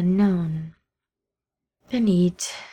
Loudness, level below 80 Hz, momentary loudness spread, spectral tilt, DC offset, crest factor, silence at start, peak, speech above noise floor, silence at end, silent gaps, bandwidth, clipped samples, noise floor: -23 LUFS; -56 dBFS; 12 LU; -6.5 dB/octave; under 0.1%; 14 dB; 0 s; -10 dBFS; 67 dB; 0 s; none; 13.5 kHz; under 0.1%; -87 dBFS